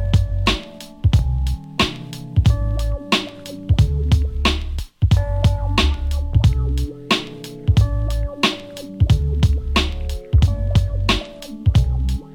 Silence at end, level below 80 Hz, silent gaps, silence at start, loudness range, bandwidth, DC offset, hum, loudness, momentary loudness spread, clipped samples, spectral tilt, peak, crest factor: 0 s; -22 dBFS; none; 0 s; 1 LU; 16 kHz; under 0.1%; none; -20 LUFS; 8 LU; under 0.1%; -5.5 dB/octave; -2 dBFS; 16 dB